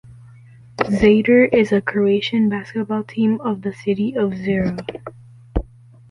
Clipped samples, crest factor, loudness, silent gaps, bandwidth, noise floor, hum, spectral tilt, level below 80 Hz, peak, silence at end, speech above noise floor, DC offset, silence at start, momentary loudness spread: under 0.1%; 16 dB; -18 LUFS; none; 10.5 kHz; -44 dBFS; none; -7.5 dB/octave; -38 dBFS; -2 dBFS; 0.45 s; 26 dB; under 0.1%; 0.1 s; 15 LU